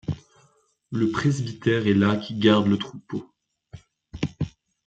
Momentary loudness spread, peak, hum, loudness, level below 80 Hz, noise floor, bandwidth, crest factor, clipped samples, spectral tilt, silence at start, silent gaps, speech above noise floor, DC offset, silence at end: 15 LU; -4 dBFS; none; -24 LUFS; -54 dBFS; -63 dBFS; 8.4 kHz; 20 dB; under 0.1%; -6.5 dB/octave; 0.1 s; none; 41 dB; under 0.1%; 0.4 s